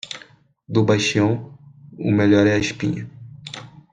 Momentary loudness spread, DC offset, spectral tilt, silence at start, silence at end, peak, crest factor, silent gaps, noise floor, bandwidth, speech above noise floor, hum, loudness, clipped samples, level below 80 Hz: 20 LU; under 0.1%; -6 dB/octave; 0.05 s; 0.25 s; -2 dBFS; 18 dB; none; -50 dBFS; 9.6 kHz; 32 dB; none; -19 LUFS; under 0.1%; -54 dBFS